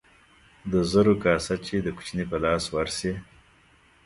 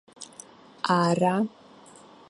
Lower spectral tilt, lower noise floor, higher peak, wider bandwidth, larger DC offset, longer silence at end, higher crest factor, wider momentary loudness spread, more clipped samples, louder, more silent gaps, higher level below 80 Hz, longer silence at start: about the same, -5.5 dB/octave vs -6 dB/octave; first, -59 dBFS vs -51 dBFS; about the same, -6 dBFS vs -8 dBFS; about the same, 11.5 kHz vs 11.5 kHz; neither; about the same, 0.8 s vs 0.8 s; about the same, 20 dB vs 20 dB; second, 11 LU vs 21 LU; neither; about the same, -25 LUFS vs -25 LUFS; neither; first, -46 dBFS vs -72 dBFS; first, 0.65 s vs 0.2 s